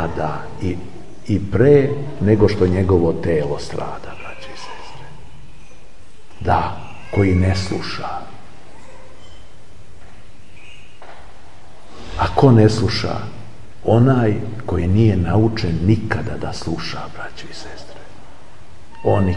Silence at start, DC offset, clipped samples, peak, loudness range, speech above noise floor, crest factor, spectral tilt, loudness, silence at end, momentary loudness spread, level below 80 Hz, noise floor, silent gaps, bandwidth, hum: 0 s; 4%; under 0.1%; 0 dBFS; 10 LU; 29 dB; 20 dB; -7.5 dB/octave; -18 LUFS; 0 s; 21 LU; -40 dBFS; -46 dBFS; none; 11 kHz; none